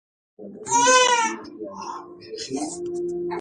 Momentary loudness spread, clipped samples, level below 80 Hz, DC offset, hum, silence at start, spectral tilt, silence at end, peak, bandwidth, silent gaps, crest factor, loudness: 22 LU; under 0.1%; -66 dBFS; under 0.1%; none; 0.4 s; -1 dB/octave; 0 s; -6 dBFS; 11.5 kHz; none; 18 dB; -21 LUFS